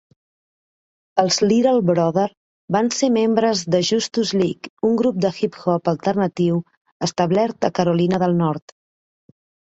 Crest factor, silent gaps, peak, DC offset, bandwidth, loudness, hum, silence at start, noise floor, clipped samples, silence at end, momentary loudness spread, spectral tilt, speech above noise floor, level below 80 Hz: 18 dB; 2.37-2.68 s, 4.70-4.77 s, 6.77-6.85 s, 6.92-7.00 s; -2 dBFS; under 0.1%; 8 kHz; -19 LUFS; none; 1.15 s; under -90 dBFS; under 0.1%; 1.1 s; 7 LU; -5.5 dB/octave; over 72 dB; -60 dBFS